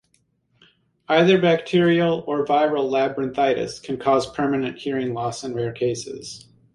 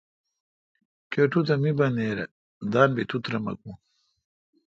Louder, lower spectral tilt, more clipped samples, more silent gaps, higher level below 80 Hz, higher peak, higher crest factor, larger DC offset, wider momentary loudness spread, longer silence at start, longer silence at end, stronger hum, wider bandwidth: first, -21 LUFS vs -25 LUFS; second, -5.5 dB/octave vs -8 dB/octave; neither; second, none vs 2.31-2.61 s; about the same, -60 dBFS vs -64 dBFS; about the same, -4 dBFS vs -4 dBFS; second, 18 dB vs 24 dB; neither; second, 11 LU vs 15 LU; about the same, 1.1 s vs 1.1 s; second, 0.35 s vs 0.9 s; neither; first, 11.5 kHz vs 7.6 kHz